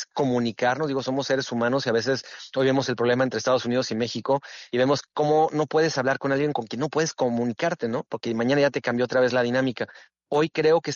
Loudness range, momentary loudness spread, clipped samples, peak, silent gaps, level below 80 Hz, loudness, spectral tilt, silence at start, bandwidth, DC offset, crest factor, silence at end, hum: 1 LU; 6 LU; under 0.1%; -10 dBFS; none; -66 dBFS; -24 LUFS; -4 dB/octave; 0 s; 7.4 kHz; under 0.1%; 14 dB; 0 s; none